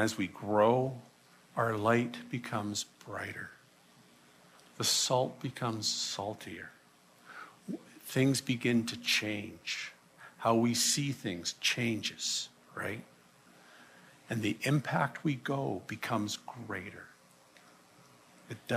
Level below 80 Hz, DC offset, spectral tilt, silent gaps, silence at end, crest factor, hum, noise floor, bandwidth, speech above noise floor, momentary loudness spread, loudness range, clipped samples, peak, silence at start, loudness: -76 dBFS; under 0.1%; -3.5 dB/octave; none; 0 s; 20 dB; none; -62 dBFS; 15 kHz; 29 dB; 17 LU; 5 LU; under 0.1%; -14 dBFS; 0 s; -33 LUFS